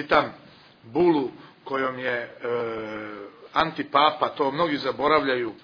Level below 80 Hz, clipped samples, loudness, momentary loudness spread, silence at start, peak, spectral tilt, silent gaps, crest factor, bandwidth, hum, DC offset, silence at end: -60 dBFS; under 0.1%; -25 LUFS; 13 LU; 0 s; -4 dBFS; -6.5 dB/octave; none; 20 dB; 5.4 kHz; none; under 0.1%; 0.1 s